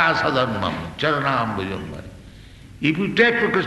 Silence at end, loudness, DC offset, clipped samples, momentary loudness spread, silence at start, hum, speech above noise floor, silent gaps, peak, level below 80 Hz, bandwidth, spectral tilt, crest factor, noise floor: 0 s; -21 LUFS; under 0.1%; under 0.1%; 15 LU; 0 s; none; 21 dB; none; -2 dBFS; -48 dBFS; 12 kHz; -6 dB/octave; 20 dB; -42 dBFS